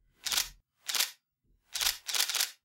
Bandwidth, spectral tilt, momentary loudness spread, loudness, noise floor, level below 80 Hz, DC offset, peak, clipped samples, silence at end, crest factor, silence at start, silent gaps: 17 kHz; 3 dB/octave; 9 LU; -31 LUFS; -73 dBFS; -62 dBFS; under 0.1%; -12 dBFS; under 0.1%; 0.1 s; 24 dB; 0.25 s; none